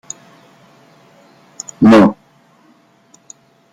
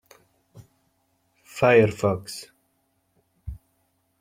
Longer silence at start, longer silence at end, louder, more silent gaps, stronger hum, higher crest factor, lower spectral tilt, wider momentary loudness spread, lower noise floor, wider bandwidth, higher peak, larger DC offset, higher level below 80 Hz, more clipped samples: first, 1.8 s vs 1.55 s; first, 1.6 s vs 0.65 s; first, -10 LUFS vs -21 LUFS; neither; neither; second, 16 dB vs 22 dB; about the same, -6 dB/octave vs -6 dB/octave; about the same, 25 LU vs 25 LU; second, -51 dBFS vs -71 dBFS; second, 9.8 kHz vs 16 kHz; first, 0 dBFS vs -4 dBFS; neither; about the same, -50 dBFS vs -52 dBFS; neither